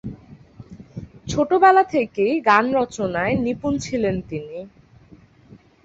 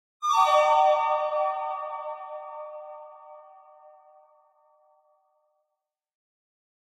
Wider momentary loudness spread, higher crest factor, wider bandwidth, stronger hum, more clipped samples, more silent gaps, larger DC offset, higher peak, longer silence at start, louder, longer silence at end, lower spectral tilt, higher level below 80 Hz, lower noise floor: about the same, 22 LU vs 22 LU; about the same, 20 dB vs 20 dB; second, 8 kHz vs 15 kHz; neither; neither; neither; neither; first, -2 dBFS vs -8 dBFS; second, 0.05 s vs 0.2 s; first, -19 LUFS vs -24 LUFS; second, 1.15 s vs 3.4 s; first, -5.5 dB/octave vs 0.5 dB/octave; first, -48 dBFS vs -76 dBFS; second, -49 dBFS vs -84 dBFS